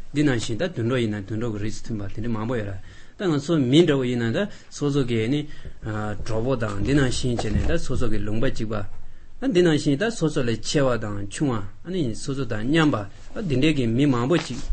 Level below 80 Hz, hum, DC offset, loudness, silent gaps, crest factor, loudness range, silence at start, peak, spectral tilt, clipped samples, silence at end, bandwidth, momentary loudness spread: -34 dBFS; none; under 0.1%; -24 LUFS; none; 16 dB; 2 LU; 0 s; -6 dBFS; -6 dB/octave; under 0.1%; 0 s; 8.8 kHz; 11 LU